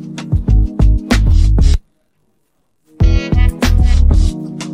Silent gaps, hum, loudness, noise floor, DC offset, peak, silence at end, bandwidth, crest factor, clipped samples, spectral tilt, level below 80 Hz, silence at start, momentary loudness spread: none; none; -14 LUFS; -65 dBFS; under 0.1%; -2 dBFS; 0 s; 11 kHz; 10 dB; under 0.1%; -6.5 dB/octave; -12 dBFS; 0 s; 7 LU